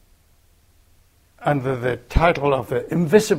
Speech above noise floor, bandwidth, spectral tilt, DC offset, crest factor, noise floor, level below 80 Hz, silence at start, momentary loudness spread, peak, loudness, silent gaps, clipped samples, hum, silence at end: 38 dB; 16 kHz; -6 dB/octave; under 0.1%; 20 dB; -56 dBFS; -34 dBFS; 1.4 s; 7 LU; -2 dBFS; -21 LUFS; none; under 0.1%; none; 0 s